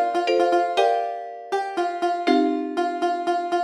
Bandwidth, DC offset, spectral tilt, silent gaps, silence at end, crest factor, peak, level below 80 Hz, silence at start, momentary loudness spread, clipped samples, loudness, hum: 11.5 kHz; under 0.1%; -3 dB/octave; none; 0 s; 16 dB; -6 dBFS; -78 dBFS; 0 s; 7 LU; under 0.1%; -23 LUFS; none